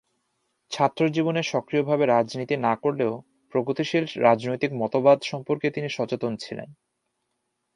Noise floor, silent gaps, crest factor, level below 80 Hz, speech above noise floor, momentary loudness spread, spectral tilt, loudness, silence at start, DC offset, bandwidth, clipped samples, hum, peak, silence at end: -77 dBFS; none; 20 dB; -70 dBFS; 54 dB; 9 LU; -6 dB/octave; -24 LUFS; 0.7 s; under 0.1%; 11 kHz; under 0.1%; none; -4 dBFS; 1.05 s